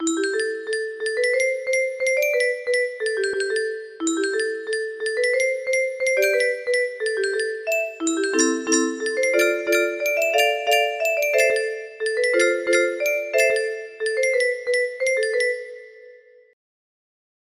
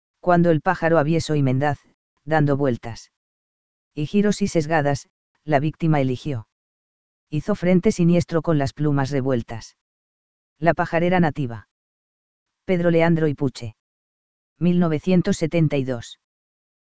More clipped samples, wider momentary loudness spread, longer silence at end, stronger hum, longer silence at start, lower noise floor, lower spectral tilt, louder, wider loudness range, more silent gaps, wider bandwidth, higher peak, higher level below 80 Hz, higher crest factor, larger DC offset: neither; second, 7 LU vs 14 LU; first, 1.35 s vs 0.75 s; neither; second, 0 s vs 0.15 s; second, -48 dBFS vs under -90 dBFS; second, -0.5 dB/octave vs -7 dB/octave; about the same, -21 LUFS vs -21 LUFS; about the same, 3 LU vs 3 LU; second, none vs 1.94-2.17 s, 3.17-3.91 s, 5.10-5.35 s, 6.52-7.27 s, 9.81-10.56 s, 11.71-12.46 s, 13.80-14.56 s; first, 15.5 kHz vs 8 kHz; about the same, -4 dBFS vs -2 dBFS; second, -70 dBFS vs -50 dBFS; about the same, 18 dB vs 20 dB; second, under 0.1% vs 2%